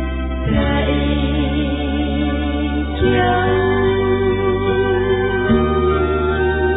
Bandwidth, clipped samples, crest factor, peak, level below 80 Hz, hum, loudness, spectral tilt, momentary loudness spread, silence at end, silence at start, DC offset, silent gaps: 4 kHz; under 0.1%; 12 dB; -4 dBFS; -24 dBFS; none; -17 LUFS; -11 dB/octave; 4 LU; 0 s; 0 s; under 0.1%; none